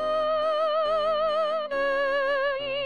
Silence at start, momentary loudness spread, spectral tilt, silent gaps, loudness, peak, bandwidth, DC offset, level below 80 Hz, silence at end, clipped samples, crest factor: 0 s; 2 LU; -3.5 dB/octave; none; -25 LUFS; -16 dBFS; 9.2 kHz; 0.3%; -58 dBFS; 0 s; under 0.1%; 10 dB